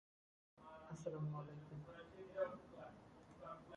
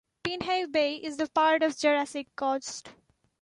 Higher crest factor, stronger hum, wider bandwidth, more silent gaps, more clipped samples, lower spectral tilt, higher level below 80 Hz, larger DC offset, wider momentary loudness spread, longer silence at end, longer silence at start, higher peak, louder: about the same, 20 dB vs 18 dB; neither; about the same, 10.5 kHz vs 11.5 kHz; neither; neither; first, -7.5 dB/octave vs -3 dB/octave; second, -76 dBFS vs -66 dBFS; neither; first, 15 LU vs 11 LU; second, 0 s vs 0.5 s; first, 0.55 s vs 0.25 s; second, -32 dBFS vs -12 dBFS; second, -51 LUFS vs -28 LUFS